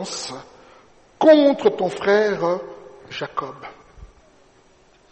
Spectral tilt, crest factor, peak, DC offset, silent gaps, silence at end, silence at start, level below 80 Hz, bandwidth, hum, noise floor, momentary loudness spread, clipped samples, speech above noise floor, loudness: -4.5 dB/octave; 18 dB; -2 dBFS; under 0.1%; none; 1.05 s; 0 s; -56 dBFS; 8.8 kHz; none; -54 dBFS; 25 LU; under 0.1%; 36 dB; -19 LUFS